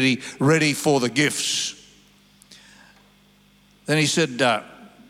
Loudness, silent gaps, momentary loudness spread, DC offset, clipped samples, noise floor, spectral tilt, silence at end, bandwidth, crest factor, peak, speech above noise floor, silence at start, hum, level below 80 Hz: -21 LUFS; none; 7 LU; under 0.1%; under 0.1%; -56 dBFS; -4 dB/octave; 0.2 s; 16 kHz; 18 dB; -6 dBFS; 35 dB; 0 s; 50 Hz at -50 dBFS; -68 dBFS